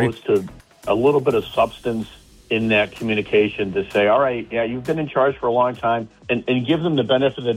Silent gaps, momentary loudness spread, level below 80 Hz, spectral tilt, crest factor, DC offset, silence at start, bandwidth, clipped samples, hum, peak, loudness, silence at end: none; 8 LU; -50 dBFS; -6.5 dB/octave; 14 dB; under 0.1%; 0 s; 15 kHz; under 0.1%; none; -6 dBFS; -20 LUFS; 0 s